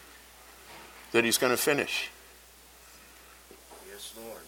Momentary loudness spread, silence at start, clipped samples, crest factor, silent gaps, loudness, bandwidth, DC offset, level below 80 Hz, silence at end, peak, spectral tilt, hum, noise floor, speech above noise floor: 26 LU; 0 s; under 0.1%; 24 dB; none; -27 LUFS; 18 kHz; under 0.1%; -64 dBFS; 0 s; -8 dBFS; -2.5 dB/octave; none; -54 dBFS; 26 dB